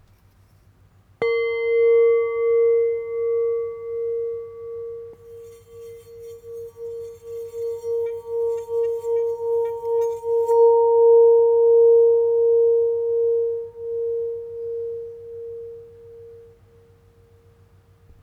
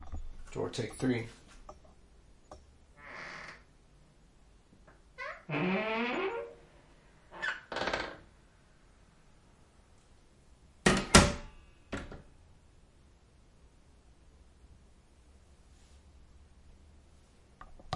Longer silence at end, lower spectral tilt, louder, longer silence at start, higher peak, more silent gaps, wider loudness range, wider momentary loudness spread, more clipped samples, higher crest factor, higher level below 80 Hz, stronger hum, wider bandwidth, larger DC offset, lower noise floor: first, 1.8 s vs 0 s; about the same, -5 dB/octave vs -4 dB/octave; first, -20 LUFS vs -32 LUFS; first, 1.2 s vs 0 s; about the same, -8 dBFS vs -6 dBFS; neither; about the same, 19 LU vs 21 LU; second, 21 LU vs 28 LU; neither; second, 14 dB vs 32 dB; second, -62 dBFS vs -48 dBFS; neither; second, 4.6 kHz vs 11.5 kHz; neither; second, -55 dBFS vs -62 dBFS